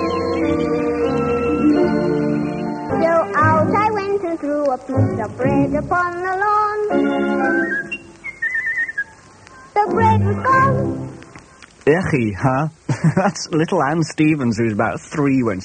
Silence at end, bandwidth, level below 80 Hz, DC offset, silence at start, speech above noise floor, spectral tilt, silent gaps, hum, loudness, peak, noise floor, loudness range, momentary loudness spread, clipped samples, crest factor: 0 s; 9.4 kHz; -46 dBFS; under 0.1%; 0 s; 26 dB; -7 dB/octave; none; none; -18 LUFS; -2 dBFS; -43 dBFS; 2 LU; 8 LU; under 0.1%; 16 dB